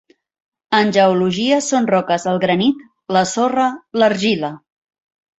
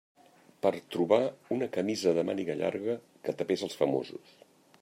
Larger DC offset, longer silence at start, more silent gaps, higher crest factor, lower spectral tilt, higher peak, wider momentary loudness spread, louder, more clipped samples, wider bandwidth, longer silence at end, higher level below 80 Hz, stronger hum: neither; about the same, 0.7 s vs 0.65 s; neither; second, 16 dB vs 22 dB; about the same, -4.5 dB/octave vs -5.5 dB/octave; first, -2 dBFS vs -10 dBFS; second, 6 LU vs 9 LU; first, -16 LUFS vs -31 LUFS; neither; second, 8.2 kHz vs 16 kHz; first, 0.85 s vs 0.65 s; first, -60 dBFS vs -78 dBFS; neither